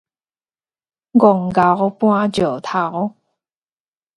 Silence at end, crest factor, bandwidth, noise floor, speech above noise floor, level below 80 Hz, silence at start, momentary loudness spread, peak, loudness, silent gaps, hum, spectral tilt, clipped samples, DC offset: 1.1 s; 18 dB; 11.5 kHz; under -90 dBFS; over 75 dB; -54 dBFS; 1.15 s; 8 LU; 0 dBFS; -16 LUFS; none; none; -7.5 dB/octave; under 0.1%; under 0.1%